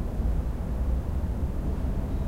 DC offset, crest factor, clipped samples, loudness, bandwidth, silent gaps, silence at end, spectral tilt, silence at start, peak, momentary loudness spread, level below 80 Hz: 0.6%; 12 dB; under 0.1%; -31 LUFS; 13 kHz; none; 0 s; -8.5 dB/octave; 0 s; -16 dBFS; 1 LU; -28 dBFS